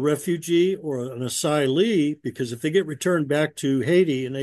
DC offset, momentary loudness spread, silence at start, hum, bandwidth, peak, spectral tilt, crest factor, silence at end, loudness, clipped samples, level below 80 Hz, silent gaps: under 0.1%; 8 LU; 0 s; none; 12.5 kHz; -8 dBFS; -5.5 dB/octave; 14 dB; 0 s; -23 LUFS; under 0.1%; -68 dBFS; none